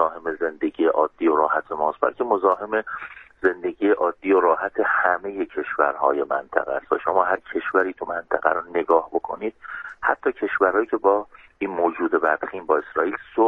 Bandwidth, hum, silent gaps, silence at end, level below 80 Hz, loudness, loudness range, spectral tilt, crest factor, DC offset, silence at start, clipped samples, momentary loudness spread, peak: 3.9 kHz; none; none; 0 s; -60 dBFS; -22 LUFS; 2 LU; -7.5 dB/octave; 20 dB; under 0.1%; 0 s; under 0.1%; 8 LU; -2 dBFS